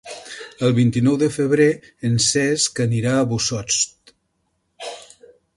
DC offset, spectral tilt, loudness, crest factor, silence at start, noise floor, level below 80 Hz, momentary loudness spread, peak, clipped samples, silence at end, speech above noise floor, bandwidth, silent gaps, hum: under 0.1%; -4.5 dB/octave; -19 LUFS; 16 dB; 0.05 s; -70 dBFS; -54 dBFS; 17 LU; -4 dBFS; under 0.1%; 0.55 s; 52 dB; 11.5 kHz; none; none